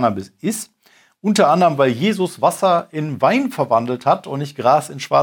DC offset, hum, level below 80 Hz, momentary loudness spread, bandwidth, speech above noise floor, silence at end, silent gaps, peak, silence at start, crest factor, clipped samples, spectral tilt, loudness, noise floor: under 0.1%; none; -68 dBFS; 11 LU; 19.5 kHz; 36 dB; 0 s; none; 0 dBFS; 0 s; 18 dB; under 0.1%; -5.5 dB/octave; -18 LUFS; -53 dBFS